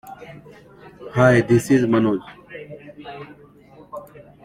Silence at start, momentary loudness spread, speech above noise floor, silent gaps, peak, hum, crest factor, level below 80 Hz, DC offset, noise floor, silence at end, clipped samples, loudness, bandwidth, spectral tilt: 0.05 s; 24 LU; 31 dB; none; -2 dBFS; 50 Hz at -50 dBFS; 20 dB; -54 dBFS; under 0.1%; -47 dBFS; 0.4 s; under 0.1%; -18 LUFS; 15.5 kHz; -7 dB/octave